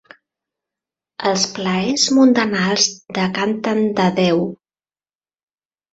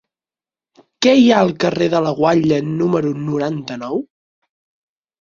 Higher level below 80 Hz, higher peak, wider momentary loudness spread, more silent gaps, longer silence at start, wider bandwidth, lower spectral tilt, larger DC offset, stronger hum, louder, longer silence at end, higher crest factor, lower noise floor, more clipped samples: about the same, -60 dBFS vs -56 dBFS; about the same, -2 dBFS vs 0 dBFS; second, 8 LU vs 12 LU; neither; first, 1.2 s vs 1 s; about the same, 8 kHz vs 7.4 kHz; second, -4 dB/octave vs -6 dB/octave; neither; neither; about the same, -17 LUFS vs -16 LUFS; first, 1.4 s vs 1.15 s; about the same, 18 dB vs 18 dB; about the same, under -90 dBFS vs under -90 dBFS; neither